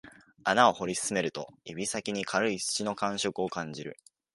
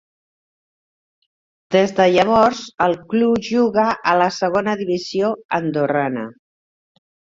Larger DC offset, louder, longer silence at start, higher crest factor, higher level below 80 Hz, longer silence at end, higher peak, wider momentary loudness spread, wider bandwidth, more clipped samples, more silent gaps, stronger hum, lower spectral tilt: neither; second, -29 LUFS vs -18 LUFS; second, 0.05 s vs 1.7 s; first, 24 dB vs 18 dB; second, -68 dBFS vs -56 dBFS; second, 0.4 s vs 1.05 s; second, -8 dBFS vs 0 dBFS; first, 16 LU vs 7 LU; first, 12 kHz vs 7.8 kHz; neither; second, none vs 5.45-5.49 s; neither; second, -3 dB/octave vs -5.5 dB/octave